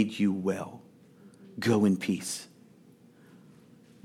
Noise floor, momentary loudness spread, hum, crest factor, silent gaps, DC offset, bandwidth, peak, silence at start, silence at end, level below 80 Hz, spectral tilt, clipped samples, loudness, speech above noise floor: -57 dBFS; 22 LU; none; 20 dB; none; under 0.1%; 15 kHz; -12 dBFS; 0 s; 1.6 s; -78 dBFS; -5.5 dB/octave; under 0.1%; -29 LUFS; 29 dB